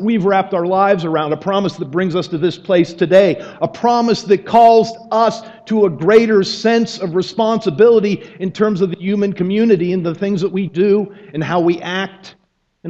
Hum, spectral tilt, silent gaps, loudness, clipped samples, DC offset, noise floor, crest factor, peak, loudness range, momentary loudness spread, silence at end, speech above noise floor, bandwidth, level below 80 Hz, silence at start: none; -6.5 dB/octave; none; -15 LUFS; under 0.1%; under 0.1%; -34 dBFS; 14 dB; 0 dBFS; 3 LU; 9 LU; 0 s; 20 dB; 8 kHz; -56 dBFS; 0 s